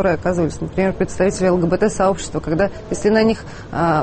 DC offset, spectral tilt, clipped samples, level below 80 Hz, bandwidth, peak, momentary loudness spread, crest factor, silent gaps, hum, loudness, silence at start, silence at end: under 0.1%; -6 dB/octave; under 0.1%; -36 dBFS; 8.8 kHz; -4 dBFS; 6 LU; 14 dB; none; none; -19 LUFS; 0 s; 0 s